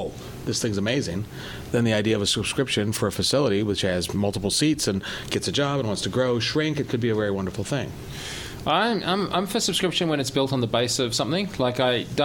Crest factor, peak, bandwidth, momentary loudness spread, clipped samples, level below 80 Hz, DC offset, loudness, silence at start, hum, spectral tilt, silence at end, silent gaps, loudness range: 16 dB; -8 dBFS; 18.5 kHz; 8 LU; under 0.1%; -48 dBFS; under 0.1%; -24 LUFS; 0 s; none; -4.5 dB/octave; 0 s; none; 2 LU